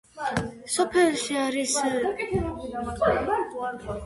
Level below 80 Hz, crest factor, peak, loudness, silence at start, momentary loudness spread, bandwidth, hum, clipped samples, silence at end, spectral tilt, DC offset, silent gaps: -46 dBFS; 16 dB; -10 dBFS; -26 LUFS; 0.15 s; 10 LU; 11.5 kHz; none; under 0.1%; 0 s; -4 dB/octave; under 0.1%; none